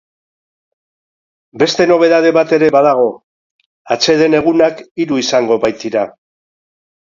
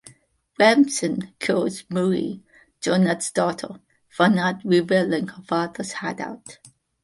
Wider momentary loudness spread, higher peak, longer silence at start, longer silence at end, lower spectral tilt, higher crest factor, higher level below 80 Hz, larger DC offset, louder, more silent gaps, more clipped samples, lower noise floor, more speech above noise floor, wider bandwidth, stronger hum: second, 8 LU vs 14 LU; about the same, 0 dBFS vs -2 dBFS; first, 1.55 s vs 0.05 s; first, 0.95 s vs 0.5 s; about the same, -4.5 dB/octave vs -5 dB/octave; second, 14 dB vs 20 dB; first, -56 dBFS vs -64 dBFS; neither; first, -12 LUFS vs -22 LUFS; first, 3.24-3.59 s, 3.66-3.85 s, 4.91-4.95 s vs none; neither; first, under -90 dBFS vs -57 dBFS; first, over 78 dB vs 35 dB; second, 7.6 kHz vs 11.5 kHz; neither